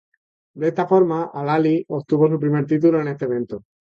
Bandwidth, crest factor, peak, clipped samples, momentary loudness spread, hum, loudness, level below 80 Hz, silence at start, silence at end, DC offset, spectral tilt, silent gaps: 6.8 kHz; 16 dB; -4 dBFS; under 0.1%; 7 LU; none; -20 LUFS; -64 dBFS; 0.55 s; 0.25 s; under 0.1%; -9.5 dB/octave; none